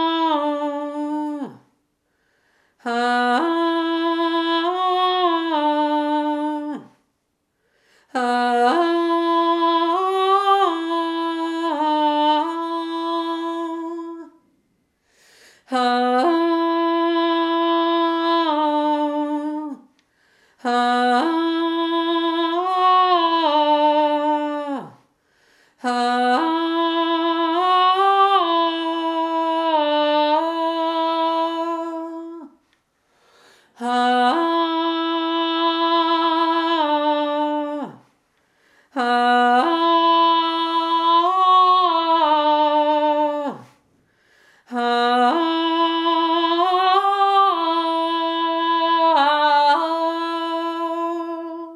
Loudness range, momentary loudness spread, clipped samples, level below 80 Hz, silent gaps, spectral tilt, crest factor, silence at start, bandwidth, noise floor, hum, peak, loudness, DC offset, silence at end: 6 LU; 10 LU; under 0.1%; -80 dBFS; none; -3.5 dB/octave; 16 dB; 0 s; 11.5 kHz; -72 dBFS; none; -4 dBFS; -19 LUFS; under 0.1%; 0 s